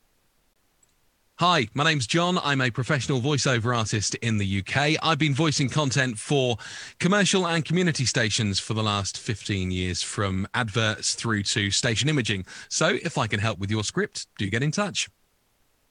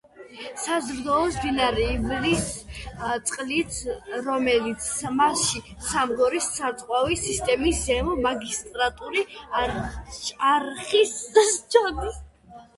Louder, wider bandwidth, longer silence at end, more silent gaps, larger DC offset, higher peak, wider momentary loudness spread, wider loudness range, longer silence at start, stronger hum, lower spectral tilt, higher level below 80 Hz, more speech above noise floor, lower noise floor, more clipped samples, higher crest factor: about the same, -24 LUFS vs -24 LUFS; about the same, 11 kHz vs 12 kHz; first, 0.85 s vs 0.15 s; neither; neither; about the same, -6 dBFS vs -4 dBFS; second, 6 LU vs 11 LU; about the same, 2 LU vs 3 LU; first, 1.4 s vs 0.15 s; neither; about the same, -4 dB/octave vs -3 dB/octave; second, -58 dBFS vs -42 dBFS; first, 42 dB vs 24 dB; first, -67 dBFS vs -48 dBFS; neither; about the same, 20 dB vs 20 dB